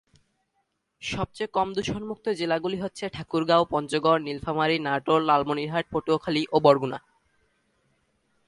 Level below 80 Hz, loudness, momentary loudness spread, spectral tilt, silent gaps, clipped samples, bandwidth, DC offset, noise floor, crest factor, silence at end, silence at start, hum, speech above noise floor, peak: -56 dBFS; -25 LUFS; 10 LU; -5.5 dB/octave; none; under 0.1%; 11.5 kHz; under 0.1%; -75 dBFS; 22 dB; 1.5 s; 1 s; none; 50 dB; -4 dBFS